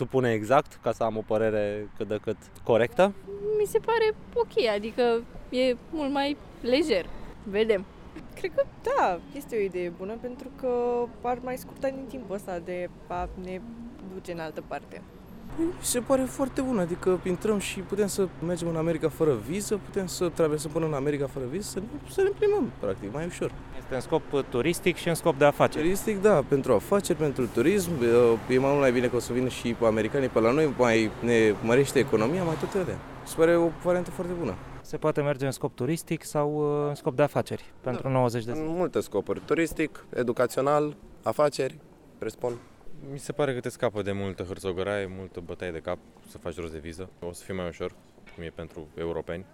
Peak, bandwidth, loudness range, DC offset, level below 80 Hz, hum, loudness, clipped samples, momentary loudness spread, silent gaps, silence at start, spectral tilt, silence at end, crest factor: -8 dBFS; 17 kHz; 10 LU; under 0.1%; -50 dBFS; none; -27 LUFS; under 0.1%; 15 LU; none; 0 s; -5.5 dB/octave; 0.1 s; 20 dB